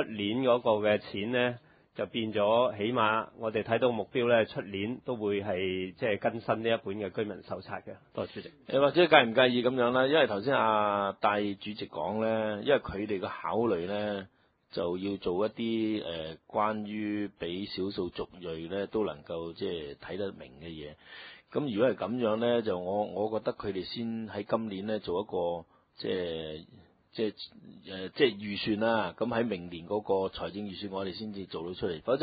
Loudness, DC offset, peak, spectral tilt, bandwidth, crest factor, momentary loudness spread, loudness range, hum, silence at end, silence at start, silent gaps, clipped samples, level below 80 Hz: -31 LUFS; under 0.1%; -4 dBFS; -9.5 dB/octave; 5 kHz; 26 dB; 13 LU; 9 LU; none; 0 s; 0 s; none; under 0.1%; -62 dBFS